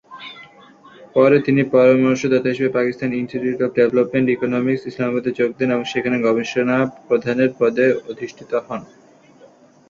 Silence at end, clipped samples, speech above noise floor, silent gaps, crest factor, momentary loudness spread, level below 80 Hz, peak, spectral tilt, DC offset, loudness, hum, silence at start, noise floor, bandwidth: 1.05 s; under 0.1%; 31 dB; none; 16 dB; 11 LU; -60 dBFS; -2 dBFS; -7 dB/octave; under 0.1%; -18 LUFS; none; 0.1 s; -48 dBFS; 7.2 kHz